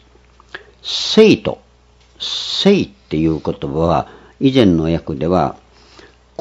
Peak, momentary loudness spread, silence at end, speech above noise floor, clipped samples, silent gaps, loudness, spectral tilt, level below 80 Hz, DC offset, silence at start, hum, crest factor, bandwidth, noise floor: 0 dBFS; 20 LU; 0.85 s; 35 dB; 0.2%; none; -16 LUFS; -6 dB/octave; -42 dBFS; under 0.1%; 0.55 s; none; 16 dB; 8 kHz; -50 dBFS